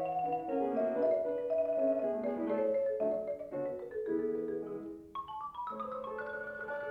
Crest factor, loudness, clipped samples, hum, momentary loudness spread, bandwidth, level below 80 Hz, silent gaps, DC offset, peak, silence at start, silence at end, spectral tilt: 14 dB; -35 LUFS; under 0.1%; none; 10 LU; 5.4 kHz; -72 dBFS; none; under 0.1%; -20 dBFS; 0 s; 0 s; -8 dB/octave